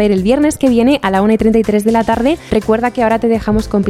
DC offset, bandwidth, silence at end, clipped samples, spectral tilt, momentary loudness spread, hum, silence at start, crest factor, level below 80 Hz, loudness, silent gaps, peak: under 0.1%; 14.5 kHz; 0 s; under 0.1%; -6 dB/octave; 3 LU; none; 0 s; 12 dB; -32 dBFS; -13 LUFS; none; 0 dBFS